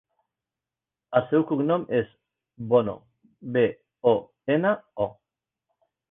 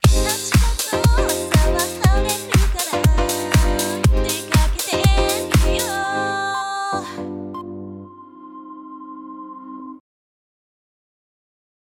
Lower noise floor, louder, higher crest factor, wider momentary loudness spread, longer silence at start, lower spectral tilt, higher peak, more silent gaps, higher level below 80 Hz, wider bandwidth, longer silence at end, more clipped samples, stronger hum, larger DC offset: first, -90 dBFS vs -40 dBFS; second, -25 LUFS vs -19 LUFS; about the same, 22 dB vs 18 dB; second, 10 LU vs 19 LU; first, 1.1 s vs 0.05 s; first, -10.5 dB/octave vs -4.5 dB/octave; second, -6 dBFS vs -2 dBFS; neither; second, -64 dBFS vs -24 dBFS; second, 3.9 kHz vs 18 kHz; second, 1 s vs 2 s; neither; neither; neither